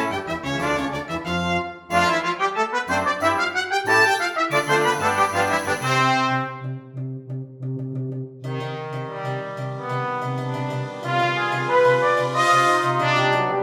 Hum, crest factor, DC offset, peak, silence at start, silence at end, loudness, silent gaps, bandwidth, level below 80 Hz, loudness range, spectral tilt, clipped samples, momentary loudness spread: none; 18 dB; under 0.1%; -4 dBFS; 0 s; 0 s; -21 LUFS; none; 18 kHz; -54 dBFS; 9 LU; -4.5 dB/octave; under 0.1%; 13 LU